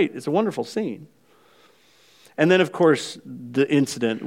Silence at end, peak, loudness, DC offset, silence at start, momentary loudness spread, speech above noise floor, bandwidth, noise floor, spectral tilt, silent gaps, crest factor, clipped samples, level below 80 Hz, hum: 0 s; -4 dBFS; -22 LUFS; under 0.1%; 0 s; 16 LU; 35 dB; 16 kHz; -57 dBFS; -5.5 dB/octave; none; 20 dB; under 0.1%; -76 dBFS; none